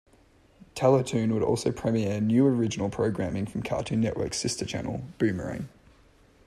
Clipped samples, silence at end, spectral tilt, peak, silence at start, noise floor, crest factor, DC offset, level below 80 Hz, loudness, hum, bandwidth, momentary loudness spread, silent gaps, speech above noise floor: under 0.1%; 0.8 s; -6 dB/octave; -10 dBFS; 0.75 s; -59 dBFS; 18 dB; under 0.1%; -54 dBFS; -27 LUFS; none; 13 kHz; 11 LU; none; 33 dB